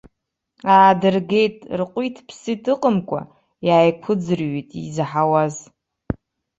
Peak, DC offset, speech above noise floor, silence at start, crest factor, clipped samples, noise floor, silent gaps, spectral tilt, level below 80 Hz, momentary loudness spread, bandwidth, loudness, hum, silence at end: -2 dBFS; under 0.1%; 58 dB; 0.65 s; 18 dB; under 0.1%; -76 dBFS; none; -6.5 dB/octave; -50 dBFS; 16 LU; 8.2 kHz; -19 LUFS; none; 0.45 s